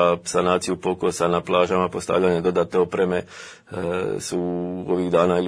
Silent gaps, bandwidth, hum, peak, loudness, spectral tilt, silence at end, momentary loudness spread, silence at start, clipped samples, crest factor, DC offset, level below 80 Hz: none; 11 kHz; none; -4 dBFS; -22 LUFS; -5.5 dB/octave; 0 s; 8 LU; 0 s; under 0.1%; 18 dB; under 0.1%; -54 dBFS